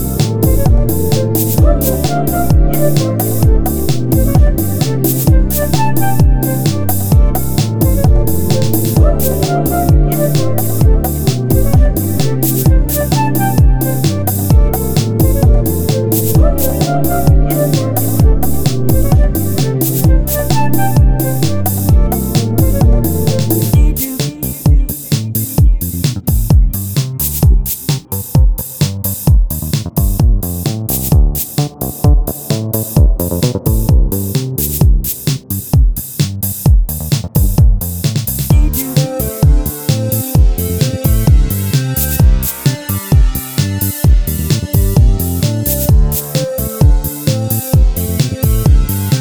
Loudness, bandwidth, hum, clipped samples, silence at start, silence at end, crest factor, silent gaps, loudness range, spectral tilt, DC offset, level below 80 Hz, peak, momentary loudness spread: -13 LUFS; over 20 kHz; none; under 0.1%; 0 s; 0 s; 10 dB; none; 2 LU; -6 dB/octave; under 0.1%; -14 dBFS; 0 dBFS; 5 LU